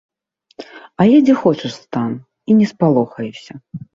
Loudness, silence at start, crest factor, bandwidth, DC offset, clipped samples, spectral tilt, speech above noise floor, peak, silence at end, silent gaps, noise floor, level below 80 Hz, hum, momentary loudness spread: -15 LUFS; 0.6 s; 14 dB; 7.6 kHz; under 0.1%; under 0.1%; -8 dB/octave; 28 dB; -2 dBFS; 0.15 s; none; -43 dBFS; -58 dBFS; none; 23 LU